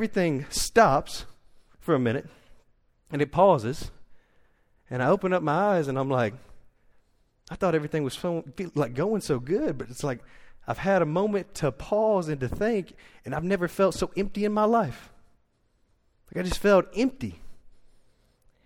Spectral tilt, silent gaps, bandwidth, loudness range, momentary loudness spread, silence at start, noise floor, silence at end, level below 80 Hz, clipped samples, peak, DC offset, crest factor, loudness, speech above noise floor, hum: -6 dB/octave; none; 17 kHz; 3 LU; 15 LU; 0 s; -67 dBFS; 0.95 s; -48 dBFS; under 0.1%; -6 dBFS; under 0.1%; 22 dB; -26 LUFS; 42 dB; none